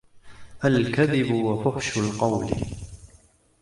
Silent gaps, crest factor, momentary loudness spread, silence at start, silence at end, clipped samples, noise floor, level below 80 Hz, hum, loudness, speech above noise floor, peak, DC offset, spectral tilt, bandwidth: none; 18 dB; 11 LU; 0.15 s; 0.55 s; under 0.1%; -57 dBFS; -46 dBFS; none; -24 LUFS; 34 dB; -8 dBFS; under 0.1%; -6 dB/octave; 11.5 kHz